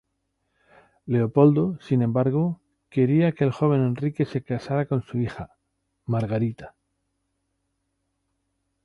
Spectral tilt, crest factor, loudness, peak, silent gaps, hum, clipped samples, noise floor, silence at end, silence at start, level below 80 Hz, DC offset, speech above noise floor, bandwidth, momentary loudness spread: -10 dB/octave; 20 dB; -24 LUFS; -4 dBFS; none; none; under 0.1%; -76 dBFS; 2.15 s; 1.05 s; -58 dBFS; under 0.1%; 54 dB; 6.8 kHz; 15 LU